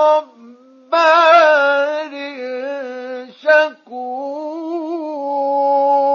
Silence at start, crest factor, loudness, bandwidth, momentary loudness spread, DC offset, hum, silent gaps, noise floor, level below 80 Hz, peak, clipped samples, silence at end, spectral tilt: 0 s; 16 dB; -15 LUFS; 7.2 kHz; 17 LU; under 0.1%; none; none; -43 dBFS; under -90 dBFS; 0 dBFS; under 0.1%; 0 s; -2 dB/octave